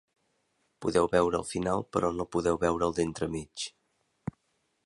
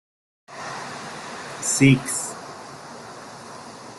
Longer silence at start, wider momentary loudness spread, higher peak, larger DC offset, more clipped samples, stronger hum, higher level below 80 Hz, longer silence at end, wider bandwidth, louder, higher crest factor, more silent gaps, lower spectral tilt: first, 0.8 s vs 0.5 s; second, 15 LU vs 22 LU; second, -10 dBFS vs -4 dBFS; neither; neither; neither; first, -52 dBFS vs -58 dBFS; first, 1.15 s vs 0 s; about the same, 11.5 kHz vs 12.5 kHz; second, -30 LUFS vs -23 LUFS; about the same, 20 dB vs 22 dB; neither; about the same, -5.5 dB/octave vs -4.5 dB/octave